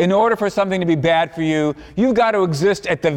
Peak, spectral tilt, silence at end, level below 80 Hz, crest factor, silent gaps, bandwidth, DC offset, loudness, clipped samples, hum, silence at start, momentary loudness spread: -6 dBFS; -6 dB/octave; 0 s; -48 dBFS; 10 dB; none; 16.5 kHz; under 0.1%; -17 LUFS; under 0.1%; none; 0 s; 4 LU